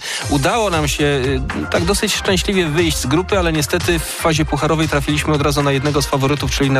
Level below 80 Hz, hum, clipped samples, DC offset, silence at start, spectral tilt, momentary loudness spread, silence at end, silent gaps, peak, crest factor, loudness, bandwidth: -28 dBFS; none; under 0.1%; under 0.1%; 0 s; -4.5 dB/octave; 2 LU; 0 s; none; -6 dBFS; 12 dB; -16 LUFS; 15.5 kHz